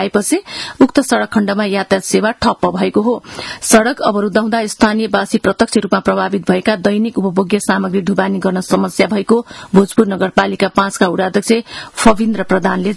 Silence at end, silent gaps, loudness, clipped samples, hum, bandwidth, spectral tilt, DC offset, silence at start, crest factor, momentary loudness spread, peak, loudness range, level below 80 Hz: 0 s; none; -14 LUFS; 0.2%; none; 12 kHz; -5 dB/octave; under 0.1%; 0 s; 14 dB; 4 LU; 0 dBFS; 1 LU; -42 dBFS